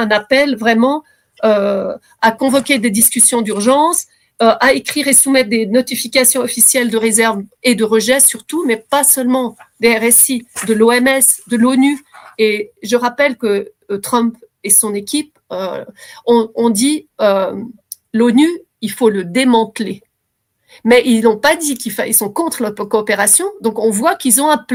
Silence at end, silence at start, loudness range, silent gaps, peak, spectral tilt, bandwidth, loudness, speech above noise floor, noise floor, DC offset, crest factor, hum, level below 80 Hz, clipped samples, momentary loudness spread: 0 s; 0 s; 4 LU; none; 0 dBFS; -2.5 dB/octave; 18.5 kHz; -13 LUFS; 56 dB; -70 dBFS; under 0.1%; 14 dB; none; -56 dBFS; under 0.1%; 12 LU